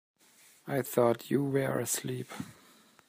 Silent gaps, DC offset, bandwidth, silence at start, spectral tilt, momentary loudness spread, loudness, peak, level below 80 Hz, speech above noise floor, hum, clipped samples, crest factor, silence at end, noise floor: none; under 0.1%; 15.5 kHz; 0.65 s; -5 dB/octave; 16 LU; -31 LUFS; -12 dBFS; -74 dBFS; 31 dB; none; under 0.1%; 20 dB; 0.55 s; -62 dBFS